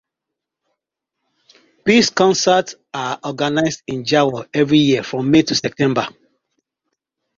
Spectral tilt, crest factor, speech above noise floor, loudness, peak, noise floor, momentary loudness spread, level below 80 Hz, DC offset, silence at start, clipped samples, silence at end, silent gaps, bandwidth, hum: -4.5 dB/octave; 18 dB; 66 dB; -17 LUFS; -2 dBFS; -82 dBFS; 11 LU; -56 dBFS; under 0.1%; 1.85 s; under 0.1%; 1.3 s; none; 7.6 kHz; none